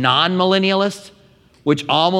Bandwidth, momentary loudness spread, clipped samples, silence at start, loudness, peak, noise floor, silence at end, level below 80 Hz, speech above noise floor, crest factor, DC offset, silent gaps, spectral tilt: 12 kHz; 10 LU; under 0.1%; 0 s; -17 LUFS; 0 dBFS; -51 dBFS; 0 s; -62 dBFS; 35 dB; 16 dB; under 0.1%; none; -5.5 dB/octave